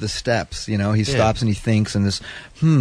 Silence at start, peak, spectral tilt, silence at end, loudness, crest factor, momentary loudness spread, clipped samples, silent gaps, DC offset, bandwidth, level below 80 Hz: 0 s; -6 dBFS; -6 dB/octave; 0 s; -20 LUFS; 14 dB; 6 LU; under 0.1%; none; under 0.1%; 11 kHz; -40 dBFS